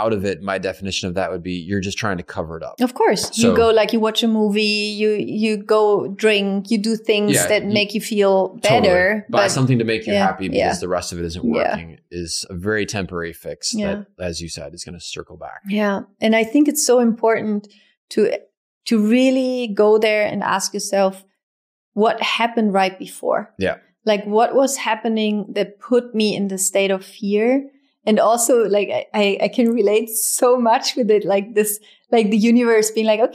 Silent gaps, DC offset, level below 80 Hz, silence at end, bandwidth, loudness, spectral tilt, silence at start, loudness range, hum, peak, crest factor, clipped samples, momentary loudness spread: 17.97-18.08 s, 18.57-18.81 s, 21.43-21.92 s; under 0.1%; -52 dBFS; 0 s; 15.5 kHz; -18 LUFS; -4 dB/octave; 0 s; 6 LU; none; -2 dBFS; 16 dB; under 0.1%; 11 LU